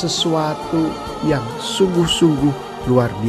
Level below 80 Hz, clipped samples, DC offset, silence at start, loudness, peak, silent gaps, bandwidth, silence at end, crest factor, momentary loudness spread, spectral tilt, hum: -40 dBFS; under 0.1%; under 0.1%; 0 s; -18 LUFS; -2 dBFS; none; 13 kHz; 0 s; 16 dB; 8 LU; -5 dB/octave; none